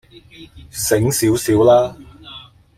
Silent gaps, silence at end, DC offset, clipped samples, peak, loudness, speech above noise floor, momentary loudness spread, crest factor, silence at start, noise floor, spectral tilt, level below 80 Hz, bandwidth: none; 0.35 s; under 0.1%; under 0.1%; -2 dBFS; -15 LUFS; 24 dB; 24 LU; 16 dB; 0.4 s; -40 dBFS; -5 dB/octave; -46 dBFS; 16 kHz